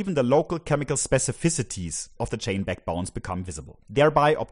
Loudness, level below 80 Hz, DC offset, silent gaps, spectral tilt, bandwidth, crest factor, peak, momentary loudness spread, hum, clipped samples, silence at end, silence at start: -25 LUFS; -46 dBFS; under 0.1%; none; -4.5 dB/octave; 11 kHz; 20 dB; -4 dBFS; 12 LU; none; under 0.1%; 0.05 s; 0 s